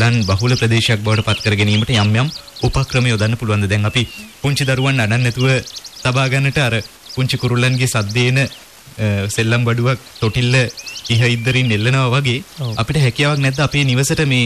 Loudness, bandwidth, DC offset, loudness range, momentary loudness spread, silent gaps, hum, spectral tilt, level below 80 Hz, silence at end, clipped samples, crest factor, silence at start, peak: -16 LUFS; 14 kHz; 0.1%; 2 LU; 7 LU; none; none; -5 dB/octave; -38 dBFS; 0 s; under 0.1%; 12 dB; 0 s; -4 dBFS